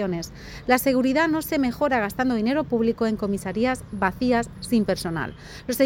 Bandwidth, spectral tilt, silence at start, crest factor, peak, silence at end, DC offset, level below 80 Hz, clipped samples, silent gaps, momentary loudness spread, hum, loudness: 17 kHz; -5.5 dB/octave; 0 s; 18 dB; -6 dBFS; 0 s; under 0.1%; -46 dBFS; under 0.1%; none; 10 LU; none; -24 LUFS